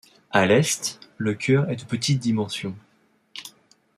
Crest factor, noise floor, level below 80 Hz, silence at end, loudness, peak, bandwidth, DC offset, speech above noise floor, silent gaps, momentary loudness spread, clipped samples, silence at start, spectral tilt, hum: 22 dB; -63 dBFS; -64 dBFS; 0.5 s; -23 LUFS; -2 dBFS; 14.5 kHz; under 0.1%; 41 dB; none; 20 LU; under 0.1%; 0.3 s; -4.5 dB/octave; none